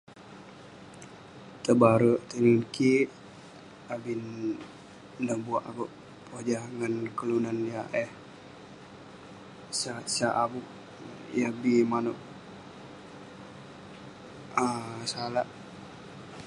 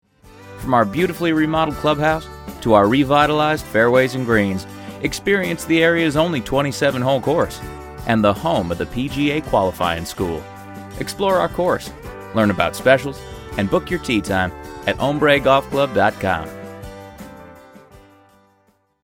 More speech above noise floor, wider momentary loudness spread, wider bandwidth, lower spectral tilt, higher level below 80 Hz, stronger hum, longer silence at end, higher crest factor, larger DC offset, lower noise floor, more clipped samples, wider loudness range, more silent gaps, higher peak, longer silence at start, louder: second, 21 dB vs 43 dB; first, 23 LU vs 18 LU; second, 11.5 kHz vs 17 kHz; about the same, -5.5 dB/octave vs -5.5 dB/octave; second, -68 dBFS vs -42 dBFS; neither; second, 0 s vs 1.25 s; first, 26 dB vs 20 dB; neither; second, -49 dBFS vs -61 dBFS; neither; first, 9 LU vs 4 LU; neither; second, -6 dBFS vs 0 dBFS; second, 0.1 s vs 0.25 s; second, -29 LUFS vs -18 LUFS